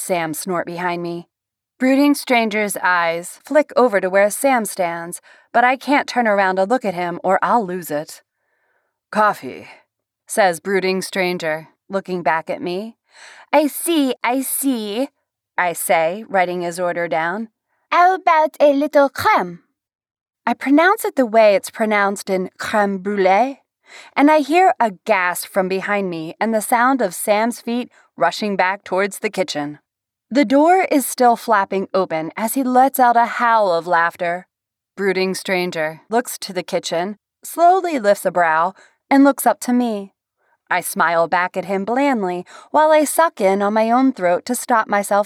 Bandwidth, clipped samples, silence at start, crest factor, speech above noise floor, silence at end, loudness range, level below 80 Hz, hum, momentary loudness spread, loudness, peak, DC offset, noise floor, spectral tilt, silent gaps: 17.5 kHz; under 0.1%; 0 s; 14 dB; 50 dB; 0 s; 4 LU; -74 dBFS; none; 11 LU; -18 LUFS; -4 dBFS; under 0.1%; -67 dBFS; -4 dB/octave; 19.95-19.99 s, 20.21-20.26 s